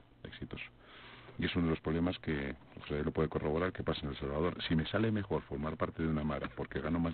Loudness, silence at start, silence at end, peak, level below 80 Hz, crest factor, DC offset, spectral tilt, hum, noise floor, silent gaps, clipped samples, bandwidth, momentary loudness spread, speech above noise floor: -36 LUFS; 0.25 s; 0 s; -18 dBFS; -50 dBFS; 18 dB; under 0.1%; -5.5 dB/octave; none; -55 dBFS; none; under 0.1%; 4.6 kHz; 15 LU; 20 dB